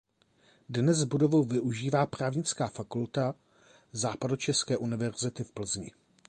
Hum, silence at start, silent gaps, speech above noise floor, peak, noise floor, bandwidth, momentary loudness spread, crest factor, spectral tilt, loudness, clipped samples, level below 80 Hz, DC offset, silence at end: none; 0.7 s; none; 36 dB; -12 dBFS; -66 dBFS; 10.5 kHz; 10 LU; 18 dB; -5 dB/octave; -30 LUFS; under 0.1%; -64 dBFS; under 0.1%; 0.4 s